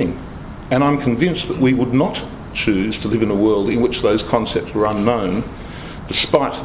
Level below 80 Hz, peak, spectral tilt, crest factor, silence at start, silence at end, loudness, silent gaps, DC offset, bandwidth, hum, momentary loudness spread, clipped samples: -38 dBFS; 0 dBFS; -11 dB/octave; 18 dB; 0 s; 0 s; -18 LUFS; none; under 0.1%; 4 kHz; none; 14 LU; under 0.1%